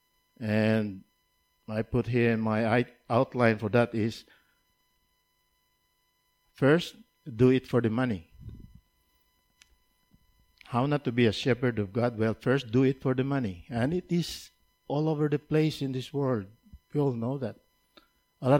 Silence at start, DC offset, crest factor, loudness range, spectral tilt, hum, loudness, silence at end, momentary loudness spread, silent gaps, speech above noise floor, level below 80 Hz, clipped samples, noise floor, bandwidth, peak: 0.4 s; under 0.1%; 20 dB; 5 LU; -7.5 dB/octave; none; -28 LUFS; 0 s; 13 LU; none; 46 dB; -58 dBFS; under 0.1%; -73 dBFS; 16.5 kHz; -10 dBFS